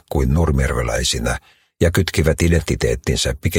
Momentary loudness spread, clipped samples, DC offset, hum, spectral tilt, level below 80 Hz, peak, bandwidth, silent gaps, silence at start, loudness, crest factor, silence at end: 3 LU; under 0.1%; under 0.1%; none; -5 dB/octave; -26 dBFS; 0 dBFS; 17 kHz; none; 0.1 s; -18 LUFS; 18 dB; 0 s